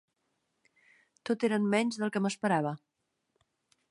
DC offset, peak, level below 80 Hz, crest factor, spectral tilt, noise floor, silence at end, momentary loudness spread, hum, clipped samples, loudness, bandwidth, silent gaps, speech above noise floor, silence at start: under 0.1%; -14 dBFS; -82 dBFS; 20 dB; -5.5 dB/octave; -80 dBFS; 1.15 s; 11 LU; none; under 0.1%; -30 LUFS; 11.5 kHz; none; 50 dB; 1.25 s